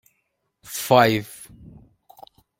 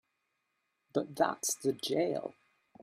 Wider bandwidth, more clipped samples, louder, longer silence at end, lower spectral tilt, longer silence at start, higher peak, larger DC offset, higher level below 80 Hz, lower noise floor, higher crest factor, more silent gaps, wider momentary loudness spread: about the same, 16.5 kHz vs 15.5 kHz; neither; first, -20 LUFS vs -34 LUFS; first, 1.15 s vs 0 s; about the same, -4.5 dB/octave vs -3.5 dB/octave; second, 0.7 s vs 0.95 s; first, -2 dBFS vs -14 dBFS; neither; first, -56 dBFS vs -80 dBFS; second, -74 dBFS vs -82 dBFS; about the same, 22 dB vs 22 dB; neither; first, 25 LU vs 7 LU